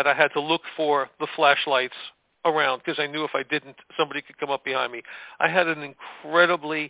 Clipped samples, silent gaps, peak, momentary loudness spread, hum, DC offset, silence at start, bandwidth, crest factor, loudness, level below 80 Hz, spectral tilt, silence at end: under 0.1%; none; -4 dBFS; 14 LU; none; under 0.1%; 0 s; 4 kHz; 22 dB; -24 LUFS; -74 dBFS; -7.5 dB/octave; 0 s